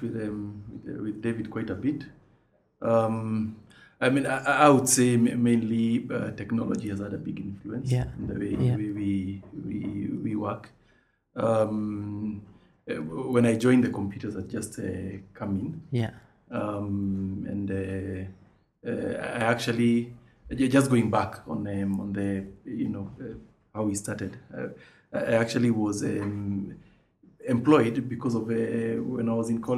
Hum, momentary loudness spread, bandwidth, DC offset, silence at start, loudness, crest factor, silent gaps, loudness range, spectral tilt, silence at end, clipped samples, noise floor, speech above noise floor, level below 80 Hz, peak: none; 15 LU; 14.5 kHz; under 0.1%; 0 s; -28 LUFS; 24 dB; none; 9 LU; -6 dB/octave; 0 s; under 0.1%; -65 dBFS; 38 dB; -56 dBFS; -4 dBFS